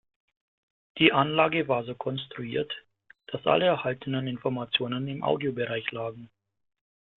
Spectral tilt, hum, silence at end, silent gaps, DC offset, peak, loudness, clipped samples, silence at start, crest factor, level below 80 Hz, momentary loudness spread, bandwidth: -9 dB/octave; none; 0.9 s; none; under 0.1%; -4 dBFS; -27 LUFS; under 0.1%; 0.95 s; 26 dB; -66 dBFS; 13 LU; 4.3 kHz